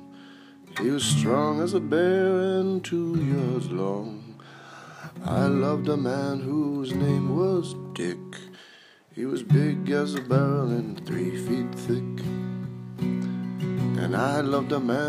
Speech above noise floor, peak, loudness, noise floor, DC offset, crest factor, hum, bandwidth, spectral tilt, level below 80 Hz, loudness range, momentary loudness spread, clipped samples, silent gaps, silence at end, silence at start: 28 dB; -8 dBFS; -26 LUFS; -53 dBFS; under 0.1%; 18 dB; none; 15 kHz; -6.5 dB/octave; -62 dBFS; 4 LU; 15 LU; under 0.1%; none; 0 s; 0 s